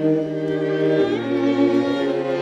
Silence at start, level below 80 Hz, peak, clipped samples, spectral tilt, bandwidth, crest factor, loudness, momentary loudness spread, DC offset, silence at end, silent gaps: 0 s; -62 dBFS; -8 dBFS; under 0.1%; -7.5 dB/octave; 7.8 kHz; 12 dB; -20 LUFS; 4 LU; under 0.1%; 0 s; none